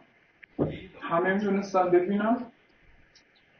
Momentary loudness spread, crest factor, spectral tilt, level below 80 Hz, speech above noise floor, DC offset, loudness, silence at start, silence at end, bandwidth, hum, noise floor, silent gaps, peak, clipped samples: 14 LU; 18 dB; -6 dB/octave; -60 dBFS; 36 dB; under 0.1%; -27 LUFS; 0.6 s; 1.1 s; 6.6 kHz; none; -61 dBFS; none; -12 dBFS; under 0.1%